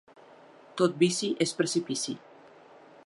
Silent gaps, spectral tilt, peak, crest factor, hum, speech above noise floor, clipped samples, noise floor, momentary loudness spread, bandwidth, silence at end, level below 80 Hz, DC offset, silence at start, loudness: none; -4 dB/octave; -10 dBFS; 20 dB; none; 26 dB; under 0.1%; -54 dBFS; 13 LU; 11.5 kHz; 0.9 s; -78 dBFS; under 0.1%; 0.75 s; -28 LUFS